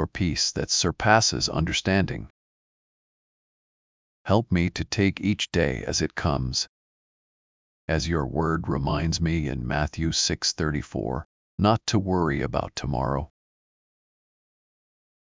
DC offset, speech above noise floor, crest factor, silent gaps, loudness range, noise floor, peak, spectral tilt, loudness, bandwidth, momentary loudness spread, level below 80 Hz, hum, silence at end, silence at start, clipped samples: under 0.1%; over 65 dB; 22 dB; 2.30-4.25 s, 6.69-7.88 s, 11.25-11.58 s; 4 LU; under -90 dBFS; -4 dBFS; -4.5 dB/octave; -25 LUFS; 7.6 kHz; 8 LU; -40 dBFS; none; 2.1 s; 0 s; under 0.1%